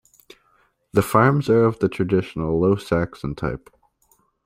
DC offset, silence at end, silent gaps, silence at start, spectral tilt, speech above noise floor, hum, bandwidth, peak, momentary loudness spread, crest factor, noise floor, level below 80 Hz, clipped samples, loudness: under 0.1%; 0.9 s; none; 0.95 s; -7.5 dB/octave; 43 dB; none; 16 kHz; -2 dBFS; 11 LU; 20 dB; -63 dBFS; -46 dBFS; under 0.1%; -21 LUFS